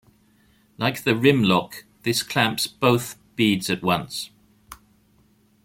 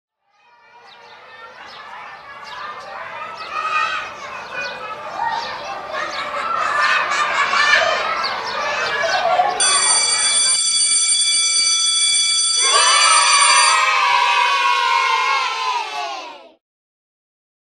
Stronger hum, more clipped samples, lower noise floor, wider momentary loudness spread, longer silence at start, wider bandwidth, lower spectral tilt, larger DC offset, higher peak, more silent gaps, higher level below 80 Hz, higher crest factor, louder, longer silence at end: neither; neither; first, -60 dBFS vs -56 dBFS; second, 14 LU vs 19 LU; second, 0.8 s vs 1.05 s; first, 17 kHz vs 14.5 kHz; first, -4.5 dB/octave vs 2.5 dB/octave; neither; about the same, -2 dBFS vs 0 dBFS; neither; about the same, -58 dBFS vs -62 dBFS; about the same, 22 dB vs 18 dB; second, -22 LUFS vs -15 LUFS; second, 0.9 s vs 1.25 s